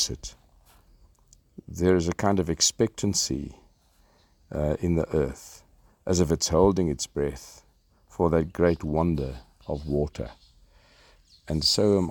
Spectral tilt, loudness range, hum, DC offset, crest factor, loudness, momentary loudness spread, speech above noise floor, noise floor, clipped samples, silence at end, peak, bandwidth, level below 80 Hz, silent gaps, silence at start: -4.5 dB/octave; 4 LU; none; under 0.1%; 20 dB; -25 LUFS; 19 LU; 37 dB; -62 dBFS; under 0.1%; 0 s; -6 dBFS; 18.5 kHz; -44 dBFS; none; 0 s